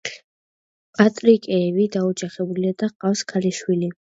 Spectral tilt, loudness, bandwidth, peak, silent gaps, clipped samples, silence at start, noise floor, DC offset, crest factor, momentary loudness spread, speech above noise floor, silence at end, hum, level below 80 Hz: -6 dB/octave; -21 LUFS; 8 kHz; 0 dBFS; 0.24-0.93 s, 2.95-3.00 s; under 0.1%; 0.05 s; under -90 dBFS; under 0.1%; 20 dB; 9 LU; over 70 dB; 0.25 s; none; -68 dBFS